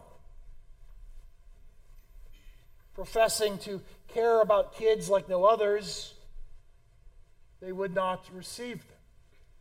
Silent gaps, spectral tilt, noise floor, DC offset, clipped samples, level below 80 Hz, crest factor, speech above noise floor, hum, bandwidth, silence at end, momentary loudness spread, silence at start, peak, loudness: none; -3.5 dB/octave; -57 dBFS; under 0.1%; under 0.1%; -52 dBFS; 20 dB; 29 dB; none; 16 kHz; 0.8 s; 18 LU; 0.15 s; -12 dBFS; -28 LUFS